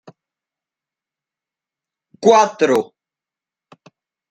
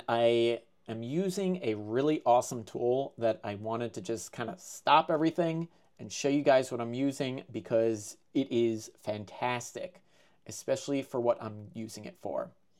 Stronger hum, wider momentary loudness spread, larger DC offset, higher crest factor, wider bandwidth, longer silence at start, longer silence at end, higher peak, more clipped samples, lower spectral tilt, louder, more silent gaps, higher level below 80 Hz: neither; second, 9 LU vs 15 LU; neither; about the same, 20 dB vs 20 dB; second, 11 kHz vs 15 kHz; first, 2.2 s vs 0.1 s; first, 1.45 s vs 0.3 s; first, -2 dBFS vs -10 dBFS; neither; about the same, -4 dB/octave vs -5 dB/octave; first, -15 LUFS vs -31 LUFS; neither; first, -68 dBFS vs -80 dBFS